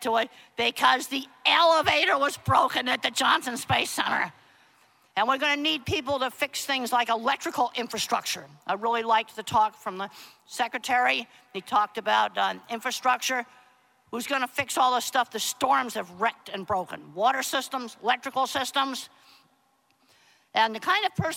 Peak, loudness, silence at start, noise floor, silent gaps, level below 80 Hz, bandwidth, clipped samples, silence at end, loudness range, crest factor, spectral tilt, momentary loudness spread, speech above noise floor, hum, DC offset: -6 dBFS; -26 LUFS; 0 s; -67 dBFS; none; -64 dBFS; 17 kHz; under 0.1%; 0 s; 5 LU; 20 dB; -2.5 dB/octave; 10 LU; 41 dB; none; under 0.1%